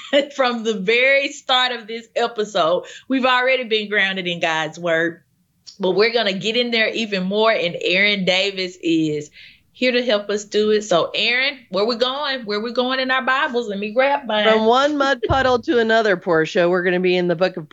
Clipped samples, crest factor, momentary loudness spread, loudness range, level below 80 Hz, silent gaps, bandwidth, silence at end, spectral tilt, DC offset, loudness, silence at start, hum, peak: under 0.1%; 18 dB; 7 LU; 3 LU; -50 dBFS; none; 8 kHz; 0.05 s; -4 dB/octave; under 0.1%; -18 LUFS; 0 s; none; -2 dBFS